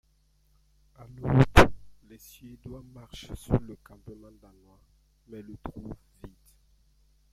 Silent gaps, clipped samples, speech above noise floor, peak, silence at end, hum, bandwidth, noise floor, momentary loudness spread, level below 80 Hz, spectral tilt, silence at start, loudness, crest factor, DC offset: none; under 0.1%; 29 dB; 0 dBFS; 1.4 s; none; 14.5 kHz; -66 dBFS; 29 LU; -38 dBFS; -6.5 dB/octave; 1.2 s; -24 LUFS; 28 dB; under 0.1%